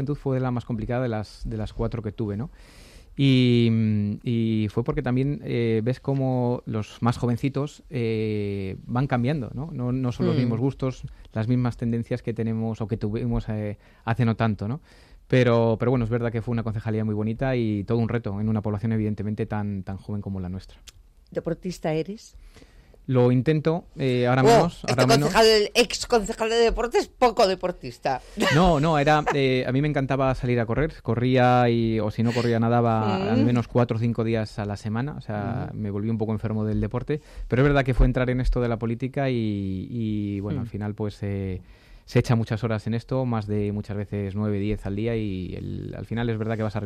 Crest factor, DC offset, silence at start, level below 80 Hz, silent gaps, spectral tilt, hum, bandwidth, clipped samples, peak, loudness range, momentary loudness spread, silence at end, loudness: 16 dB; under 0.1%; 0 s; -40 dBFS; none; -6.5 dB/octave; none; 13.5 kHz; under 0.1%; -8 dBFS; 7 LU; 11 LU; 0 s; -24 LUFS